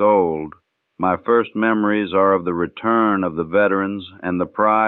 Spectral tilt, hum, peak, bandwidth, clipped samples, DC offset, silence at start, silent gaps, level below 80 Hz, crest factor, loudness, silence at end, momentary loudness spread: -10 dB/octave; none; -4 dBFS; 4.2 kHz; under 0.1%; under 0.1%; 0 s; none; -56 dBFS; 16 dB; -19 LUFS; 0 s; 8 LU